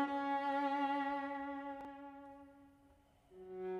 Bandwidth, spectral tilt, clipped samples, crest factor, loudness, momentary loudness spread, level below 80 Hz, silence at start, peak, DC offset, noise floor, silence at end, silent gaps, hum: 9.6 kHz; -5.5 dB/octave; under 0.1%; 16 dB; -40 LUFS; 21 LU; -76 dBFS; 0 s; -26 dBFS; under 0.1%; -68 dBFS; 0 s; none; none